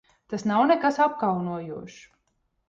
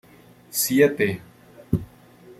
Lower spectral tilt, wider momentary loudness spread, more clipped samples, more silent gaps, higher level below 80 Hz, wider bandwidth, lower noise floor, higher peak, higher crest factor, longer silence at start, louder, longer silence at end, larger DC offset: first, -6.5 dB/octave vs -4.5 dB/octave; first, 17 LU vs 11 LU; neither; neither; second, -66 dBFS vs -50 dBFS; second, 7.8 kHz vs 15.5 kHz; first, -73 dBFS vs -51 dBFS; second, -10 dBFS vs -4 dBFS; about the same, 16 dB vs 20 dB; second, 0.3 s vs 0.5 s; about the same, -24 LUFS vs -22 LUFS; first, 0.7 s vs 0.05 s; neither